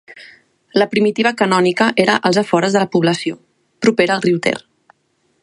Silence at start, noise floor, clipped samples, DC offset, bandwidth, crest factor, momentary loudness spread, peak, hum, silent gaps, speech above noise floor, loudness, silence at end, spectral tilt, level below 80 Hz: 0.1 s; -63 dBFS; under 0.1%; under 0.1%; 11.5 kHz; 16 dB; 7 LU; 0 dBFS; none; none; 49 dB; -15 LUFS; 0.85 s; -5 dB/octave; -62 dBFS